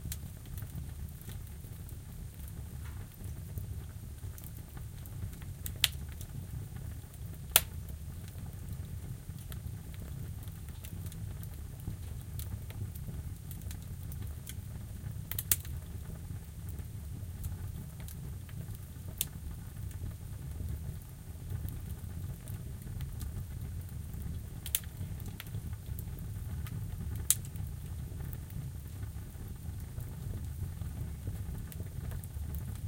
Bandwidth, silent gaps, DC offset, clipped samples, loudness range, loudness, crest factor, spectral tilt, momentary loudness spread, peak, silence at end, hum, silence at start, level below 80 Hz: 17 kHz; none; under 0.1%; under 0.1%; 8 LU; -40 LUFS; 40 dB; -3.5 dB/octave; 10 LU; 0 dBFS; 0 s; none; 0 s; -46 dBFS